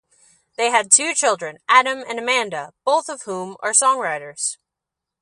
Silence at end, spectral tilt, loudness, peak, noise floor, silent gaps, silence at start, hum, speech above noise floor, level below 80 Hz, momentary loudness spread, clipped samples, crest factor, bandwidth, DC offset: 0.7 s; 0 dB/octave; -18 LUFS; 0 dBFS; -84 dBFS; none; 0.6 s; none; 65 dB; -76 dBFS; 14 LU; under 0.1%; 20 dB; 11.5 kHz; under 0.1%